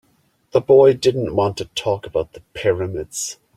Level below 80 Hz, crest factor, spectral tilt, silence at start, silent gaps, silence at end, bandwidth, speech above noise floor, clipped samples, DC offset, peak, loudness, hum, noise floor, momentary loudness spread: -50 dBFS; 18 dB; -5 dB/octave; 0.55 s; none; 0.25 s; 14.5 kHz; 43 dB; under 0.1%; under 0.1%; -2 dBFS; -19 LUFS; none; -61 dBFS; 13 LU